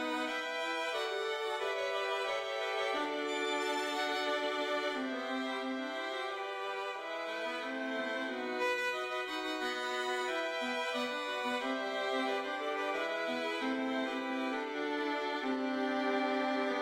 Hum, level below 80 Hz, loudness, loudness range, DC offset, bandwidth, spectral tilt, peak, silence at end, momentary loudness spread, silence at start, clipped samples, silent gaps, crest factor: none; -80 dBFS; -35 LUFS; 2 LU; under 0.1%; 16 kHz; -2 dB/octave; -22 dBFS; 0 s; 4 LU; 0 s; under 0.1%; none; 14 dB